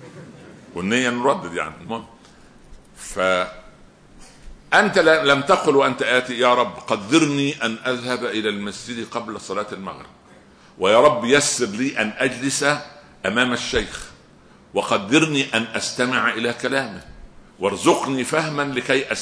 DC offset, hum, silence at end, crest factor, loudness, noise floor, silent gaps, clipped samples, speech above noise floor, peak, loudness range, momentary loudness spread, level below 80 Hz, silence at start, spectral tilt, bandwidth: under 0.1%; none; 0 s; 18 dB; -20 LUFS; -49 dBFS; none; under 0.1%; 29 dB; -2 dBFS; 7 LU; 15 LU; -50 dBFS; 0 s; -3.5 dB/octave; 11 kHz